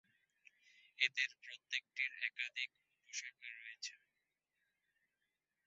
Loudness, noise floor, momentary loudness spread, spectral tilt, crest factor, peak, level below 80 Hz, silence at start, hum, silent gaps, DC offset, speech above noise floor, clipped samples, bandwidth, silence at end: -42 LUFS; -89 dBFS; 14 LU; 6 dB/octave; 30 dB; -16 dBFS; under -90 dBFS; 1 s; none; none; under 0.1%; 44 dB; under 0.1%; 7.6 kHz; 1.7 s